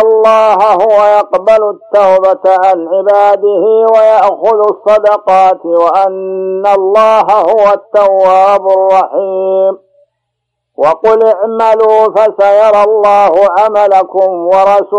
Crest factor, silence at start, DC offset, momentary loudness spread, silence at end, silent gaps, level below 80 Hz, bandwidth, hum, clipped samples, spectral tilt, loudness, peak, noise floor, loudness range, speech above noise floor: 8 dB; 0 s; under 0.1%; 5 LU; 0 s; none; -54 dBFS; 9 kHz; none; 0.2%; -5 dB/octave; -8 LUFS; 0 dBFS; -71 dBFS; 3 LU; 63 dB